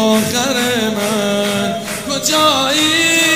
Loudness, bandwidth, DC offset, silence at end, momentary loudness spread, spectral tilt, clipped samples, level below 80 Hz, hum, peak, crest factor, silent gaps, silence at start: -14 LUFS; 16 kHz; 0.3%; 0 s; 7 LU; -2.5 dB/octave; under 0.1%; -52 dBFS; none; 0 dBFS; 14 dB; none; 0 s